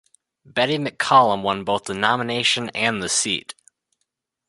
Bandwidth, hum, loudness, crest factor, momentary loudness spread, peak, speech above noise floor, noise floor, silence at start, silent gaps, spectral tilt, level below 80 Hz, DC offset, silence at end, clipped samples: 11.5 kHz; none; -20 LUFS; 20 dB; 9 LU; -2 dBFS; 56 dB; -77 dBFS; 0.55 s; none; -2.5 dB/octave; -60 dBFS; under 0.1%; 1.1 s; under 0.1%